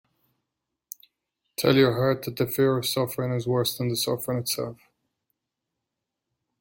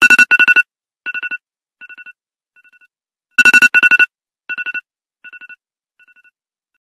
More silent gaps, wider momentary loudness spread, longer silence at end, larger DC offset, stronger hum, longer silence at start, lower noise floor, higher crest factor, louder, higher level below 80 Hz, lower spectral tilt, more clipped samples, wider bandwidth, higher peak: neither; about the same, 19 LU vs 19 LU; first, 1.85 s vs 1.35 s; neither; neither; first, 1.6 s vs 0 s; first, -84 dBFS vs -71 dBFS; first, 22 dB vs 16 dB; second, -25 LUFS vs -10 LUFS; about the same, -62 dBFS vs -62 dBFS; first, -5 dB/octave vs 0 dB/octave; neither; first, 17 kHz vs 14.5 kHz; second, -6 dBFS vs 0 dBFS